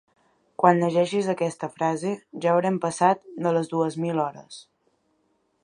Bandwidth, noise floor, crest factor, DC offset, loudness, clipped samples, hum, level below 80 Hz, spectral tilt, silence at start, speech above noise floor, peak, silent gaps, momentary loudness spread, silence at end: 11 kHz; -70 dBFS; 22 dB; under 0.1%; -24 LUFS; under 0.1%; none; -74 dBFS; -6 dB/octave; 0.6 s; 46 dB; -2 dBFS; none; 10 LU; 1 s